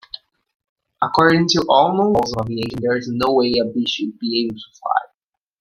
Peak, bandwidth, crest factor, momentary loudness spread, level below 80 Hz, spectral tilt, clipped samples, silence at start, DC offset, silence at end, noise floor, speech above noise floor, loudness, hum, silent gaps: 0 dBFS; 16 kHz; 18 dB; 10 LU; -50 dBFS; -5 dB/octave; under 0.1%; 1 s; under 0.1%; 0.55 s; -76 dBFS; 58 dB; -18 LUFS; none; none